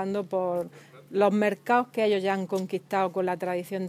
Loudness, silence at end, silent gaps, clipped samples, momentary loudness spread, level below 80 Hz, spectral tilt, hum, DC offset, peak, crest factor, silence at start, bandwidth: -27 LUFS; 0 s; none; under 0.1%; 7 LU; -78 dBFS; -6.5 dB/octave; none; under 0.1%; -10 dBFS; 18 dB; 0 s; 16 kHz